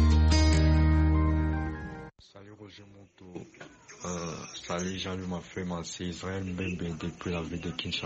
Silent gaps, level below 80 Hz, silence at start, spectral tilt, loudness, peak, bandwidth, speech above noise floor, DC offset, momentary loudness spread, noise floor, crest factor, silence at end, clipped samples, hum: none; -32 dBFS; 0 s; -6 dB/octave; -30 LUFS; -12 dBFS; 8.4 kHz; 16 dB; under 0.1%; 25 LU; -52 dBFS; 16 dB; 0 s; under 0.1%; none